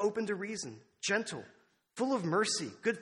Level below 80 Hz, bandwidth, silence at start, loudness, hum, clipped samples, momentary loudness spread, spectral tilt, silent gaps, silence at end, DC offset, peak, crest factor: -80 dBFS; 11.5 kHz; 0 s; -34 LUFS; none; under 0.1%; 13 LU; -3.5 dB/octave; none; 0 s; under 0.1%; -18 dBFS; 16 dB